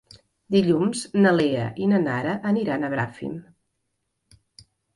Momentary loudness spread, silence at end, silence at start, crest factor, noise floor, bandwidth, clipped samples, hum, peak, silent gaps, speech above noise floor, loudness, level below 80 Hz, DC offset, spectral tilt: 11 LU; 1.55 s; 0.5 s; 18 dB; -76 dBFS; 11.5 kHz; under 0.1%; none; -6 dBFS; none; 54 dB; -23 LUFS; -62 dBFS; under 0.1%; -6.5 dB/octave